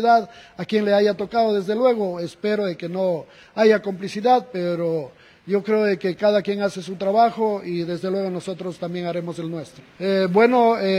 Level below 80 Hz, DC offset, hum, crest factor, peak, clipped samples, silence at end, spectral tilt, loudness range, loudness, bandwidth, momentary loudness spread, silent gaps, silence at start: -64 dBFS; under 0.1%; none; 18 dB; -4 dBFS; under 0.1%; 0 s; -6.5 dB/octave; 3 LU; -21 LUFS; 12 kHz; 12 LU; none; 0 s